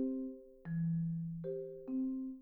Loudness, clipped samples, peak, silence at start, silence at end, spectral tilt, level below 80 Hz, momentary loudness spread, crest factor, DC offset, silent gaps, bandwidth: -40 LUFS; under 0.1%; -28 dBFS; 0 s; 0 s; -13.5 dB/octave; -68 dBFS; 8 LU; 12 dB; under 0.1%; none; 2 kHz